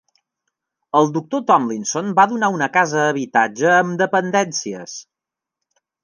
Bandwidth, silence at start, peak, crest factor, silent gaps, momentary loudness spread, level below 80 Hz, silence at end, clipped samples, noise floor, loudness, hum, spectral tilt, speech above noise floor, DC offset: 10.5 kHz; 0.95 s; -2 dBFS; 18 dB; none; 9 LU; -72 dBFS; 1 s; under 0.1%; -86 dBFS; -17 LUFS; none; -4 dB/octave; 68 dB; under 0.1%